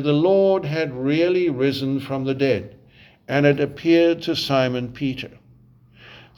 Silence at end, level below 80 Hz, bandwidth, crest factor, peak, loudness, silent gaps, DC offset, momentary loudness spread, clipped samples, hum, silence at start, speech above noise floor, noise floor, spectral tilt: 0.2 s; -56 dBFS; 13.5 kHz; 18 dB; -4 dBFS; -20 LUFS; none; under 0.1%; 9 LU; under 0.1%; none; 0 s; 32 dB; -52 dBFS; -7 dB/octave